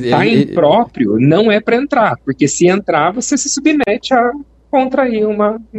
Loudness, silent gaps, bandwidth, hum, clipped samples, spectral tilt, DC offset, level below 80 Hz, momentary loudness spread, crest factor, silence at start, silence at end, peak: -13 LUFS; none; 8.6 kHz; none; under 0.1%; -5 dB/octave; under 0.1%; -48 dBFS; 5 LU; 12 dB; 0 s; 0 s; 0 dBFS